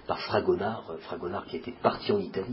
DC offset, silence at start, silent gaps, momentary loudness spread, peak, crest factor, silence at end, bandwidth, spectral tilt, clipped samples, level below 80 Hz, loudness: under 0.1%; 0 s; none; 11 LU; -8 dBFS; 22 dB; 0 s; 5.8 kHz; -10 dB/octave; under 0.1%; -58 dBFS; -30 LUFS